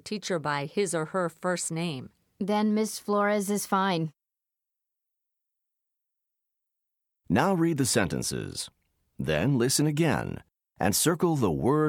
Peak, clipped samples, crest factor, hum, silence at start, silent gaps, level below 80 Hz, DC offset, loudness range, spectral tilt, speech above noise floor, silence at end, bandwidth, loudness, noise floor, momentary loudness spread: -8 dBFS; under 0.1%; 20 dB; none; 0.05 s; none; -56 dBFS; under 0.1%; 7 LU; -4.5 dB/octave; 61 dB; 0 s; 19 kHz; -27 LUFS; -88 dBFS; 11 LU